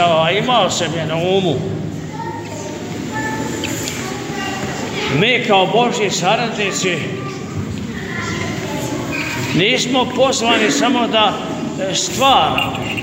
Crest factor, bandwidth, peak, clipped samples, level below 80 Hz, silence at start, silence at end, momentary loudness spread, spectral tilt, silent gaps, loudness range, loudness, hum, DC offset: 16 dB; 16.5 kHz; 0 dBFS; under 0.1%; -46 dBFS; 0 s; 0 s; 12 LU; -4 dB/octave; none; 6 LU; -17 LUFS; none; under 0.1%